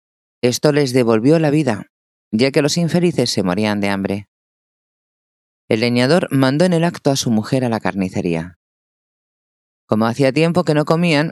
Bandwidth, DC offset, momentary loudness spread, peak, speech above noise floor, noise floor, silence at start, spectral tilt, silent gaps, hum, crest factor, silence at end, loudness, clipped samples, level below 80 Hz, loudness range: 14.5 kHz; under 0.1%; 7 LU; 0 dBFS; over 74 dB; under -90 dBFS; 0.45 s; -5.5 dB/octave; 1.90-2.31 s, 4.28-5.68 s, 8.56-9.88 s; none; 18 dB; 0 s; -17 LUFS; under 0.1%; -60 dBFS; 4 LU